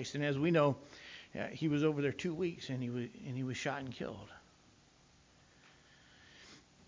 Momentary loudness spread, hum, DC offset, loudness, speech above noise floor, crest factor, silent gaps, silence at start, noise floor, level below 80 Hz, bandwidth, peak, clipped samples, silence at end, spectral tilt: 22 LU; 60 Hz at -70 dBFS; under 0.1%; -37 LUFS; 30 dB; 20 dB; none; 0 s; -66 dBFS; -70 dBFS; 7.6 kHz; -18 dBFS; under 0.1%; 0.3 s; -6.5 dB/octave